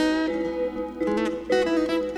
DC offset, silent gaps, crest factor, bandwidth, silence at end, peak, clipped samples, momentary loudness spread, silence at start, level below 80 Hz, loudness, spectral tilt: under 0.1%; none; 16 dB; 12 kHz; 0 s; -8 dBFS; under 0.1%; 6 LU; 0 s; -50 dBFS; -25 LUFS; -5 dB/octave